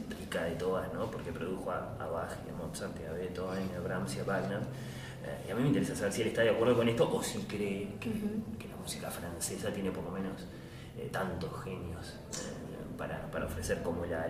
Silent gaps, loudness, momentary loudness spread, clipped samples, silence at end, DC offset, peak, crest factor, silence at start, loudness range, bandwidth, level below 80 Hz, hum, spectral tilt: none; -36 LUFS; 12 LU; under 0.1%; 0 s; under 0.1%; -16 dBFS; 20 dB; 0 s; 8 LU; 15.5 kHz; -56 dBFS; none; -5.5 dB/octave